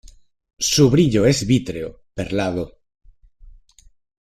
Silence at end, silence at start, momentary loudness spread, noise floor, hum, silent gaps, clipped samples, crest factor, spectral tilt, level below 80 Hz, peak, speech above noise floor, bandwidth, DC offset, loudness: 0.75 s; 0.6 s; 16 LU; -51 dBFS; none; none; under 0.1%; 18 dB; -5 dB/octave; -44 dBFS; -2 dBFS; 33 dB; 14.5 kHz; under 0.1%; -19 LUFS